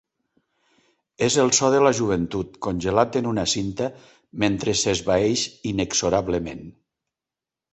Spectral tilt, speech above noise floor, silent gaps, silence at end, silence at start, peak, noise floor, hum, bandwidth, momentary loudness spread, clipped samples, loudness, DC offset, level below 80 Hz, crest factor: -4 dB/octave; 67 dB; none; 1 s; 1.2 s; -4 dBFS; -89 dBFS; none; 8.4 kHz; 11 LU; under 0.1%; -22 LUFS; under 0.1%; -48 dBFS; 20 dB